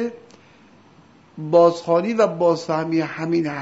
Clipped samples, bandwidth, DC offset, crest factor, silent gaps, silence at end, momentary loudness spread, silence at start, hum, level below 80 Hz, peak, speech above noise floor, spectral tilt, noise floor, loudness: under 0.1%; 8 kHz; under 0.1%; 18 dB; none; 0 s; 7 LU; 0 s; none; -70 dBFS; -2 dBFS; 32 dB; -6.5 dB/octave; -51 dBFS; -19 LUFS